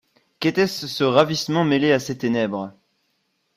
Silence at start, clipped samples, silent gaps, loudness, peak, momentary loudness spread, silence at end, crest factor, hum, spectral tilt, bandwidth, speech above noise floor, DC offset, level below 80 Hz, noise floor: 0.4 s; under 0.1%; none; -21 LUFS; -2 dBFS; 8 LU; 0.85 s; 20 dB; none; -5.5 dB/octave; 15.5 kHz; 50 dB; under 0.1%; -62 dBFS; -70 dBFS